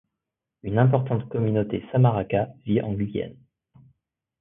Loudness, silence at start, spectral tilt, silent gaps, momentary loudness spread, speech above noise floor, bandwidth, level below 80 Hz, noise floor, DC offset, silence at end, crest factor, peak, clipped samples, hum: -24 LUFS; 0.65 s; -13 dB/octave; none; 9 LU; 62 dB; 3.7 kHz; -52 dBFS; -85 dBFS; under 0.1%; 1.1 s; 20 dB; -4 dBFS; under 0.1%; none